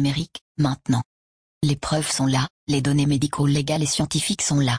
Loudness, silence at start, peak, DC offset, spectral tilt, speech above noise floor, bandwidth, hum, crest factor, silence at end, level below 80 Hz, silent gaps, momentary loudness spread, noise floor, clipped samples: -22 LUFS; 0 s; -8 dBFS; under 0.1%; -4.5 dB/octave; over 68 dB; 10.5 kHz; none; 14 dB; 0 s; -48 dBFS; 0.41-0.55 s, 1.05-1.61 s, 2.50-2.67 s; 5 LU; under -90 dBFS; under 0.1%